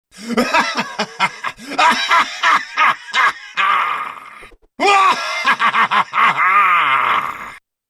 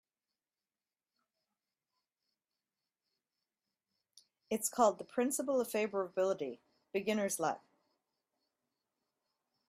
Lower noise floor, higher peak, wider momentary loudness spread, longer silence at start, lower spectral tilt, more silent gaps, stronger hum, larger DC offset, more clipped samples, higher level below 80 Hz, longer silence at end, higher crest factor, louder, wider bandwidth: second, -41 dBFS vs under -90 dBFS; first, -2 dBFS vs -16 dBFS; about the same, 11 LU vs 10 LU; second, 0.15 s vs 4.5 s; second, -2 dB/octave vs -3.5 dB/octave; neither; neither; neither; neither; first, -58 dBFS vs -86 dBFS; second, 0.3 s vs 2.1 s; second, 14 dB vs 24 dB; first, -15 LUFS vs -35 LUFS; second, 13.5 kHz vs 15.5 kHz